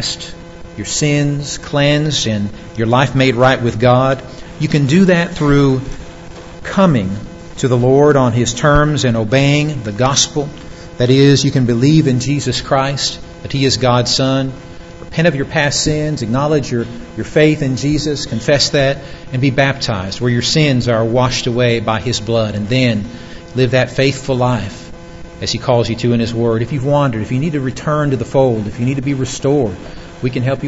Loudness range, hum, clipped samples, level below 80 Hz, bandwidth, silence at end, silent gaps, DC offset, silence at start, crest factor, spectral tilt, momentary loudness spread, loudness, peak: 4 LU; none; under 0.1%; -36 dBFS; 8 kHz; 0 s; none; 0.8%; 0 s; 14 dB; -5 dB/octave; 14 LU; -14 LUFS; 0 dBFS